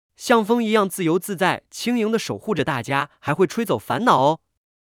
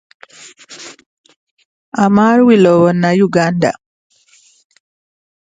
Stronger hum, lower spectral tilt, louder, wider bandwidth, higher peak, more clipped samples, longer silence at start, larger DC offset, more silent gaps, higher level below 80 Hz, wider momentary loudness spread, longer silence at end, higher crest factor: neither; second, -5 dB/octave vs -7 dB/octave; second, -21 LUFS vs -11 LUFS; first, 18.5 kHz vs 9.2 kHz; second, -4 dBFS vs 0 dBFS; neither; second, 0.2 s vs 0.7 s; neither; second, none vs 1.06-1.24 s, 1.36-1.57 s, 1.65-1.92 s; second, -62 dBFS vs -56 dBFS; second, 7 LU vs 24 LU; second, 0.45 s vs 1.75 s; about the same, 18 dB vs 14 dB